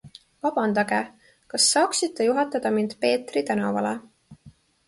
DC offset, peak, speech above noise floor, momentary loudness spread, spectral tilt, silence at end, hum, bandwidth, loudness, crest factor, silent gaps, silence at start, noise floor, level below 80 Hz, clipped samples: under 0.1%; -8 dBFS; 30 dB; 10 LU; -3 dB/octave; 0.4 s; none; 12 kHz; -23 LUFS; 18 dB; none; 0.05 s; -53 dBFS; -68 dBFS; under 0.1%